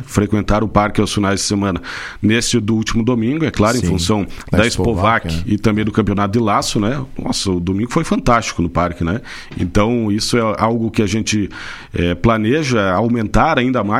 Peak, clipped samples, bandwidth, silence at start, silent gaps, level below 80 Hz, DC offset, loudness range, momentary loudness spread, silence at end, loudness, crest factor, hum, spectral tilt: 0 dBFS; under 0.1%; 15.5 kHz; 0 s; none; -30 dBFS; under 0.1%; 2 LU; 6 LU; 0 s; -16 LUFS; 16 dB; none; -5 dB/octave